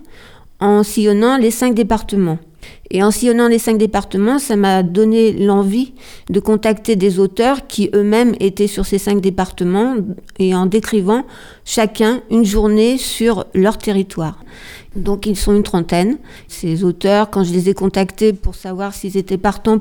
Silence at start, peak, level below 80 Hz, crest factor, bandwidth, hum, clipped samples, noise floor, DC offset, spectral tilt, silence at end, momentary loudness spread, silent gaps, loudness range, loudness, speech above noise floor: 0 s; 0 dBFS; -32 dBFS; 14 dB; 19.5 kHz; none; under 0.1%; -39 dBFS; under 0.1%; -5.5 dB/octave; 0 s; 11 LU; none; 3 LU; -15 LUFS; 25 dB